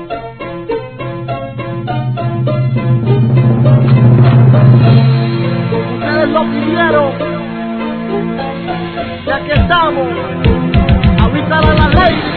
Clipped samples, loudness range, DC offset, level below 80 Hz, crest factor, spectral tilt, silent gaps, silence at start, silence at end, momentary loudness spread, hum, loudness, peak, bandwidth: 0.3%; 7 LU; 0.4%; -24 dBFS; 10 dB; -11 dB/octave; none; 0 s; 0 s; 13 LU; none; -12 LUFS; 0 dBFS; 4.5 kHz